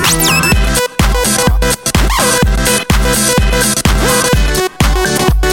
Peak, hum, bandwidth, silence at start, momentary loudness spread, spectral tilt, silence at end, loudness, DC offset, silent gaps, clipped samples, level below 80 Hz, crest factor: 0 dBFS; none; 17 kHz; 0 s; 3 LU; -3.5 dB/octave; 0 s; -11 LUFS; 0.5%; none; under 0.1%; -16 dBFS; 10 dB